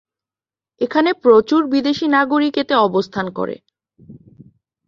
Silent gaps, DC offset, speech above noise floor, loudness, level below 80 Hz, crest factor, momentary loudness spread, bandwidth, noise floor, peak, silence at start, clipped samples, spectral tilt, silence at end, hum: none; under 0.1%; over 74 dB; -16 LUFS; -60 dBFS; 16 dB; 12 LU; 7.2 kHz; under -90 dBFS; -2 dBFS; 0.8 s; under 0.1%; -6 dB/octave; 0.75 s; none